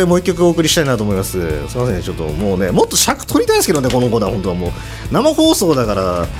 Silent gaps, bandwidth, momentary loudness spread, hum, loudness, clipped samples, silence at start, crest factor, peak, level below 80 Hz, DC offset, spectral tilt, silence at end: none; 16.5 kHz; 8 LU; none; -15 LUFS; under 0.1%; 0 s; 14 dB; 0 dBFS; -30 dBFS; under 0.1%; -4.5 dB/octave; 0 s